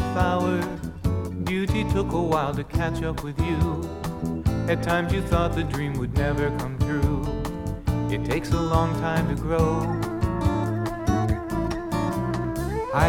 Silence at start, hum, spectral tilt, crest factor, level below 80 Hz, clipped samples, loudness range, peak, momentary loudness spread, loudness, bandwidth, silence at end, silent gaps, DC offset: 0 s; none; -7 dB/octave; 18 dB; -34 dBFS; under 0.1%; 1 LU; -6 dBFS; 5 LU; -25 LUFS; 18 kHz; 0 s; none; under 0.1%